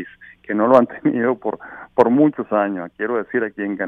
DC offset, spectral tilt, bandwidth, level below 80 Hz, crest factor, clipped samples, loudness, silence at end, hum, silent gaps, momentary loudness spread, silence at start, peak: under 0.1%; -9 dB/octave; 4.8 kHz; -62 dBFS; 18 dB; under 0.1%; -19 LUFS; 0 s; none; none; 11 LU; 0 s; 0 dBFS